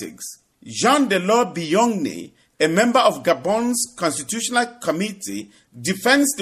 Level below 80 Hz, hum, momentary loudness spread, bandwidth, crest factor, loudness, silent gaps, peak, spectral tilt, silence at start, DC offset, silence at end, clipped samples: -64 dBFS; none; 15 LU; 15 kHz; 18 dB; -19 LUFS; none; -2 dBFS; -3.5 dB/octave; 0 s; under 0.1%; 0 s; under 0.1%